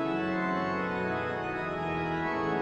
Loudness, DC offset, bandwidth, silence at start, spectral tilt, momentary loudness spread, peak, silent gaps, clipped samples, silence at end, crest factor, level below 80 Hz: -31 LUFS; under 0.1%; 8.4 kHz; 0 s; -7 dB/octave; 3 LU; -18 dBFS; none; under 0.1%; 0 s; 12 dB; -58 dBFS